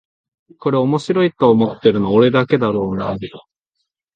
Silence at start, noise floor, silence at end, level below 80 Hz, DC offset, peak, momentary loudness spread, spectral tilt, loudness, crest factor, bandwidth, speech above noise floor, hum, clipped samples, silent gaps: 0.6 s; -75 dBFS; 0.75 s; -50 dBFS; under 0.1%; 0 dBFS; 11 LU; -8 dB/octave; -16 LUFS; 16 dB; 9 kHz; 59 dB; none; under 0.1%; none